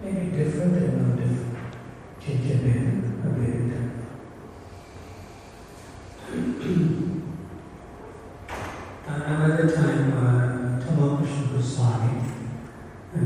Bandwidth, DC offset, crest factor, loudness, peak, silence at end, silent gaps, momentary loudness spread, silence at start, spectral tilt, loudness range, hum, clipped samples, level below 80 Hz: 10.5 kHz; under 0.1%; 16 dB; -25 LUFS; -10 dBFS; 0 s; none; 21 LU; 0 s; -8 dB/octave; 8 LU; none; under 0.1%; -50 dBFS